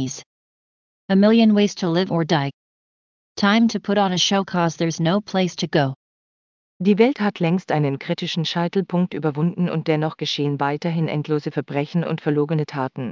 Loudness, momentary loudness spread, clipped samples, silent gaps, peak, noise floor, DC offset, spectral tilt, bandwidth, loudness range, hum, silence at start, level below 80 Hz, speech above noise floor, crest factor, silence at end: -21 LUFS; 7 LU; under 0.1%; 0.26-1.08 s, 2.54-3.35 s, 5.96-6.80 s; -2 dBFS; under -90 dBFS; under 0.1%; -6 dB/octave; 7.4 kHz; 3 LU; none; 0 s; -66 dBFS; over 70 dB; 18 dB; 0 s